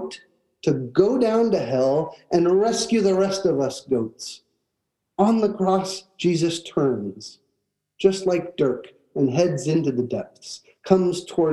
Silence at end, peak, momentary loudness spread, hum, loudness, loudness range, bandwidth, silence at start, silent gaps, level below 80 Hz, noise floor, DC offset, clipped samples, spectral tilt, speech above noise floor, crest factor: 0 s; -2 dBFS; 16 LU; none; -22 LUFS; 4 LU; 12 kHz; 0 s; none; -64 dBFS; -79 dBFS; under 0.1%; under 0.1%; -6 dB/octave; 57 dB; 20 dB